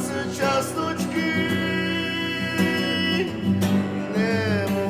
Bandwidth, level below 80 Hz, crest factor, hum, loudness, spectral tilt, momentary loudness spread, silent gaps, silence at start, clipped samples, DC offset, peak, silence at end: 16 kHz; -46 dBFS; 14 dB; none; -23 LUFS; -5 dB/octave; 3 LU; none; 0 s; under 0.1%; under 0.1%; -10 dBFS; 0 s